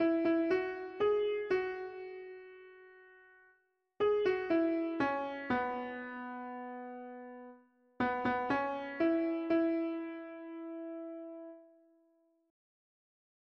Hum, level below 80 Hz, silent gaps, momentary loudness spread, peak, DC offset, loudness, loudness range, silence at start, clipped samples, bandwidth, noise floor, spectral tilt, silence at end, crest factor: none; -70 dBFS; none; 17 LU; -22 dBFS; under 0.1%; -35 LUFS; 5 LU; 0 s; under 0.1%; 6.2 kHz; -74 dBFS; -7 dB/octave; 1.85 s; 16 dB